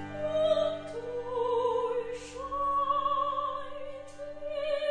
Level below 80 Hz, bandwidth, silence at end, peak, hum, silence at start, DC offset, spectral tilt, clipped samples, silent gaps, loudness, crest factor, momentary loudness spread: -58 dBFS; 10 kHz; 0 s; -16 dBFS; none; 0 s; under 0.1%; -5 dB/octave; under 0.1%; none; -31 LUFS; 16 dB; 14 LU